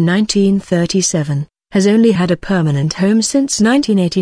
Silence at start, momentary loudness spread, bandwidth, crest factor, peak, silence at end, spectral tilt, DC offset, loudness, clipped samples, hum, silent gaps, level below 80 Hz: 0 s; 5 LU; 10.5 kHz; 12 dB; 0 dBFS; 0 s; -5 dB/octave; under 0.1%; -14 LUFS; under 0.1%; none; none; -44 dBFS